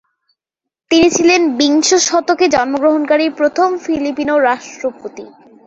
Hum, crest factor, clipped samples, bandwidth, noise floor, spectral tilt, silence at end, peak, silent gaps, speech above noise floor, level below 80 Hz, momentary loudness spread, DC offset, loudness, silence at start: none; 14 dB; under 0.1%; 8.2 kHz; -82 dBFS; -2 dB/octave; 0.4 s; 0 dBFS; none; 69 dB; -50 dBFS; 11 LU; under 0.1%; -13 LUFS; 0.9 s